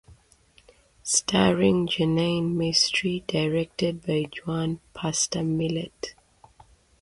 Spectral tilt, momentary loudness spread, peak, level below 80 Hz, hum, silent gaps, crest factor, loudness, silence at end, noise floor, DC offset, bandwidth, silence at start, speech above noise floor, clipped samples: -4 dB/octave; 11 LU; -6 dBFS; -54 dBFS; none; none; 20 dB; -24 LUFS; 0.9 s; -59 dBFS; under 0.1%; 11.5 kHz; 0.1 s; 34 dB; under 0.1%